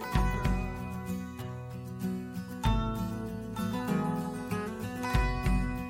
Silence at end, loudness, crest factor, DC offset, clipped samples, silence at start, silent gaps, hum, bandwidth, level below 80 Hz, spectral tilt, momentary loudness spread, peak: 0 s; -34 LUFS; 18 dB; under 0.1%; under 0.1%; 0 s; none; none; 16.5 kHz; -36 dBFS; -6.5 dB/octave; 9 LU; -14 dBFS